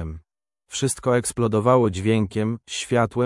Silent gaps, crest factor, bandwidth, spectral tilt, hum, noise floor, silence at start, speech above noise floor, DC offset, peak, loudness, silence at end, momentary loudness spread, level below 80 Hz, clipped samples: none; 18 dB; 12 kHz; -5.5 dB/octave; none; -67 dBFS; 0 s; 46 dB; under 0.1%; -4 dBFS; -22 LUFS; 0 s; 12 LU; -50 dBFS; under 0.1%